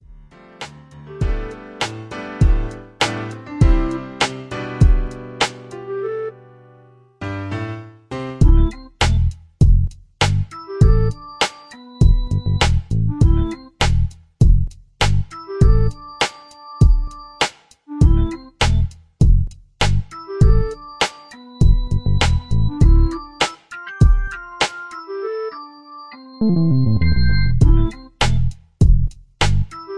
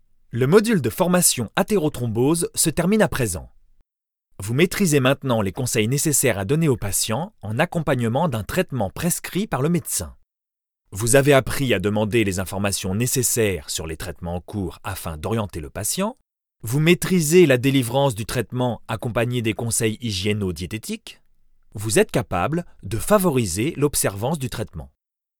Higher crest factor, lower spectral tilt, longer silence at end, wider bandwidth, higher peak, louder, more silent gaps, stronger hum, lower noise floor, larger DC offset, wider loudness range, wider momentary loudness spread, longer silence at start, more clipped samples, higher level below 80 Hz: second, 16 dB vs 22 dB; first, -6 dB/octave vs -4.5 dB/octave; second, 0 s vs 0.55 s; second, 11 kHz vs over 20 kHz; about the same, 0 dBFS vs 0 dBFS; about the same, -19 LUFS vs -21 LUFS; neither; neither; second, -49 dBFS vs -87 dBFS; neither; about the same, 4 LU vs 5 LU; about the same, 15 LU vs 13 LU; first, 0.6 s vs 0.35 s; neither; first, -20 dBFS vs -42 dBFS